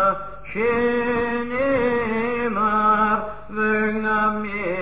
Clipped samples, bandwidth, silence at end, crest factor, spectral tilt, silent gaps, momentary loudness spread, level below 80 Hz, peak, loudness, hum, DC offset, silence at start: under 0.1%; 4 kHz; 0 s; 14 dB; -9.5 dB/octave; none; 7 LU; -46 dBFS; -8 dBFS; -21 LUFS; none; 1%; 0 s